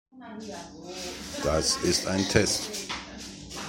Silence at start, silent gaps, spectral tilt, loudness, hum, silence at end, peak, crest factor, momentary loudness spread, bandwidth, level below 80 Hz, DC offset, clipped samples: 0.15 s; none; -3 dB/octave; -27 LUFS; none; 0 s; -6 dBFS; 24 dB; 17 LU; 16.5 kHz; -46 dBFS; under 0.1%; under 0.1%